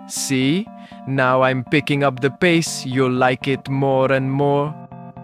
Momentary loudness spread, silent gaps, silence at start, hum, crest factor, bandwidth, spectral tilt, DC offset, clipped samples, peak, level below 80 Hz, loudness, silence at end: 9 LU; none; 0 s; none; 16 dB; 15.5 kHz; -5 dB/octave; under 0.1%; under 0.1%; -2 dBFS; -58 dBFS; -18 LUFS; 0 s